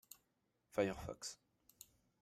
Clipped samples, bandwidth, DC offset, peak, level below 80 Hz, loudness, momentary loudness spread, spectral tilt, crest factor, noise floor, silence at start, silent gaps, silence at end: under 0.1%; 16 kHz; under 0.1%; -22 dBFS; -68 dBFS; -44 LUFS; 22 LU; -4.5 dB/octave; 24 dB; -84 dBFS; 0.75 s; none; 0.85 s